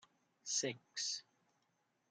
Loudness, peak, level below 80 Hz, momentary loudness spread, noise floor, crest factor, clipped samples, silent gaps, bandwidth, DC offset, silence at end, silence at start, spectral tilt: -41 LUFS; -24 dBFS; under -90 dBFS; 8 LU; -82 dBFS; 24 dB; under 0.1%; none; 11.5 kHz; under 0.1%; 0.9 s; 0.45 s; -1 dB/octave